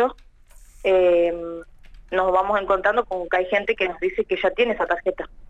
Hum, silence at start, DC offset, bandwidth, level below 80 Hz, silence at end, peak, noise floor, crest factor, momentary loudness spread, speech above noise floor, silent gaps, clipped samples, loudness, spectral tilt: none; 0 s; under 0.1%; 9.2 kHz; -46 dBFS; 0 s; -6 dBFS; -48 dBFS; 16 dB; 9 LU; 26 dB; none; under 0.1%; -22 LUFS; -5.5 dB/octave